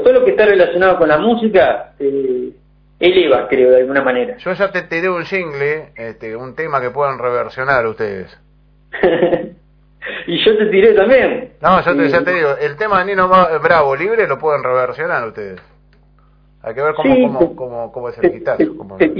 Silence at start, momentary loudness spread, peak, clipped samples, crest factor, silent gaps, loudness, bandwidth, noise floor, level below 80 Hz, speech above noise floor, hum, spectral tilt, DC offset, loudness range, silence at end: 0 s; 15 LU; 0 dBFS; under 0.1%; 14 dB; none; -14 LUFS; 5.4 kHz; -49 dBFS; -46 dBFS; 35 dB; none; -7.5 dB/octave; under 0.1%; 6 LU; 0 s